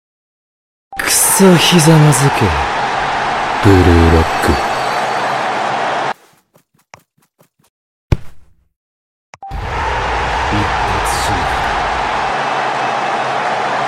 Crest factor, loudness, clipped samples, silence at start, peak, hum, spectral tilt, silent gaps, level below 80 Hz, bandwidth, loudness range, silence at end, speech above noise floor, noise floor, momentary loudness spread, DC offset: 14 dB; -13 LUFS; under 0.1%; 0.9 s; 0 dBFS; none; -4.5 dB/octave; 7.70-8.09 s, 8.76-9.33 s; -28 dBFS; 16.5 kHz; 14 LU; 0 s; 46 dB; -55 dBFS; 12 LU; under 0.1%